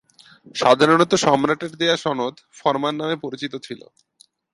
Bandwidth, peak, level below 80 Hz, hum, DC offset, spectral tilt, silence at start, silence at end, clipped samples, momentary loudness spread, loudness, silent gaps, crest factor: 11.5 kHz; -2 dBFS; -64 dBFS; none; under 0.1%; -4 dB/octave; 0.45 s; 0.75 s; under 0.1%; 16 LU; -20 LUFS; none; 20 dB